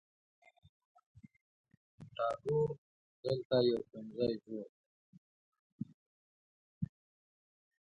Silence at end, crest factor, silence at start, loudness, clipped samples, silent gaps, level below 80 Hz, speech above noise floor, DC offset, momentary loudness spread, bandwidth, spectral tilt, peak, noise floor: 1.05 s; 22 dB; 2 s; -38 LUFS; under 0.1%; 2.78-3.23 s, 3.45-3.50 s, 4.69-5.52 s, 5.59-5.79 s, 5.94-6.81 s; -72 dBFS; over 55 dB; under 0.1%; 18 LU; 8.4 kHz; -8 dB/octave; -20 dBFS; under -90 dBFS